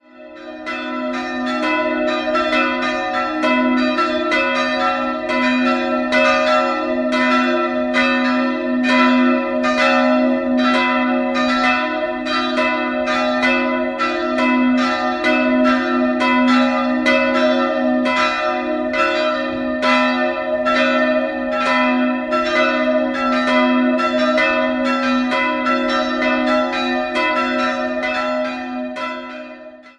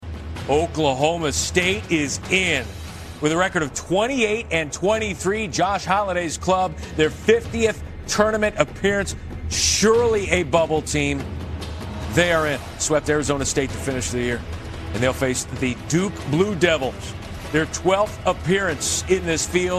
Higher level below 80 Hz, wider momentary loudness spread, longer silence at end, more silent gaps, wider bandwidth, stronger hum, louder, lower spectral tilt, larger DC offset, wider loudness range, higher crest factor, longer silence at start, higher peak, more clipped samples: second, -50 dBFS vs -40 dBFS; second, 6 LU vs 10 LU; about the same, 0.1 s vs 0 s; neither; second, 9 kHz vs 13 kHz; neither; first, -17 LUFS vs -21 LUFS; about the same, -3.5 dB/octave vs -4 dB/octave; neither; about the same, 2 LU vs 3 LU; about the same, 16 dB vs 20 dB; first, 0.15 s vs 0 s; about the same, -2 dBFS vs 0 dBFS; neither